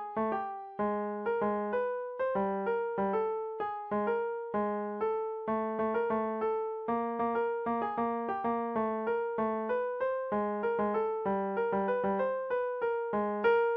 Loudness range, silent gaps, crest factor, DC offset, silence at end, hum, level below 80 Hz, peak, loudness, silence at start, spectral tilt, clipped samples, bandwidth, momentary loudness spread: 1 LU; none; 14 dB; under 0.1%; 0 s; none; -68 dBFS; -18 dBFS; -32 LUFS; 0 s; -5.5 dB/octave; under 0.1%; 4.9 kHz; 3 LU